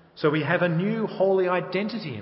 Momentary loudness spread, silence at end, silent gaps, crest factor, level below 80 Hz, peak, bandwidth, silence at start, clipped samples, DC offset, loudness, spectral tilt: 6 LU; 0 s; none; 18 dB; -70 dBFS; -6 dBFS; 5.8 kHz; 0.15 s; under 0.1%; under 0.1%; -24 LUFS; -11 dB/octave